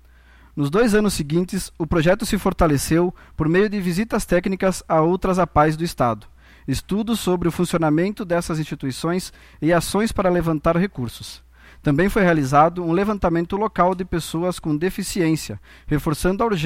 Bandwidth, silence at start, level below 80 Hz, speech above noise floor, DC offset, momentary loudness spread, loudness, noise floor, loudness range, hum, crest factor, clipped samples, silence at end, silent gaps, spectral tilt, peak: 16.5 kHz; 0.55 s; -36 dBFS; 29 dB; under 0.1%; 9 LU; -21 LUFS; -49 dBFS; 3 LU; none; 18 dB; under 0.1%; 0 s; none; -6 dB/octave; -2 dBFS